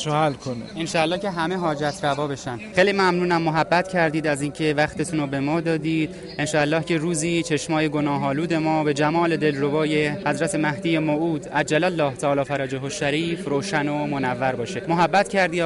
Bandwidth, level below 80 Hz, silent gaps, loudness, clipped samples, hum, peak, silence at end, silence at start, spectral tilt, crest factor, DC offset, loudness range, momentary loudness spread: 11.5 kHz; -54 dBFS; none; -22 LUFS; under 0.1%; none; -6 dBFS; 0 s; 0 s; -5 dB/octave; 16 dB; under 0.1%; 2 LU; 5 LU